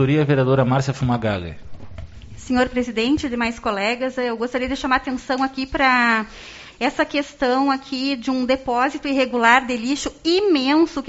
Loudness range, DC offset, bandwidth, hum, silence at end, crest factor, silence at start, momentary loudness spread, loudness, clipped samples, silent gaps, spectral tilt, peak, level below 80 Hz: 4 LU; under 0.1%; 8 kHz; none; 0 s; 20 dB; 0 s; 8 LU; -20 LUFS; under 0.1%; none; -4 dB/octave; 0 dBFS; -44 dBFS